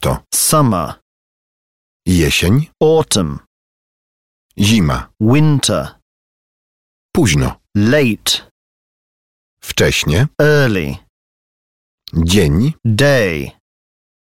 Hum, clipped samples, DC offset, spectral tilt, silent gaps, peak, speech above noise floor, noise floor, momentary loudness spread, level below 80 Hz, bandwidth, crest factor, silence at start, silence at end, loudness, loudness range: none; under 0.1%; 0.8%; -5 dB/octave; 1.02-2.00 s, 3.47-4.49 s, 6.02-7.09 s, 8.51-9.57 s, 11.09-11.98 s; 0 dBFS; over 77 dB; under -90 dBFS; 11 LU; -32 dBFS; 16.5 kHz; 16 dB; 0 s; 0.9 s; -14 LUFS; 2 LU